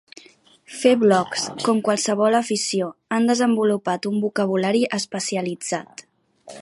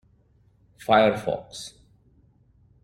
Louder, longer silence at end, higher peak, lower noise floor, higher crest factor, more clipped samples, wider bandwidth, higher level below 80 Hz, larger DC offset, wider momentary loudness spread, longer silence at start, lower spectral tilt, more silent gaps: about the same, -21 LUFS vs -22 LUFS; second, 0 s vs 1.15 s; about the same, -2 dBFS vs -4 dBFS; second, -52 dBFS vs -61 dBFS; second, 18 dB vs 24 dB; neither; second, 11.5 kHz vs 15.5 kHz; second, -72 dBFS vs -60 dBFS; neither; second, 8 LU vs 20 LU; second, 0.7 s vs 0.9 s; about the same, -4 dB/octave vs -5 dB/octave; neither